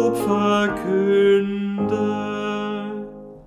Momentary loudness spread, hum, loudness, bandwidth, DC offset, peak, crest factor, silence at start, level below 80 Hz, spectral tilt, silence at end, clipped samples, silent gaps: 12 LU; none; -21 LUFS; 16 kHz; under 0.1%; -8 dBFS; 12 dB; 0 s; -52 dBFS; -6.5 dB/octave; 0.05 s; under 0.1%; none